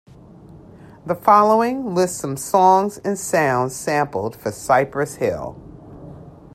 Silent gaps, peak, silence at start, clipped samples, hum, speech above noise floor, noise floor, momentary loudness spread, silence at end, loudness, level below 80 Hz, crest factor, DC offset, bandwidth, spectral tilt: none; -2 dBFS; 0.45 s; under 0.1%; none; 25 dB; -43 dBFS; 19 LU; 0.25 s; -19 LUFS; -54 dBFS; 18 dB; under 0.1%; 16 kHz; -5 dB/octave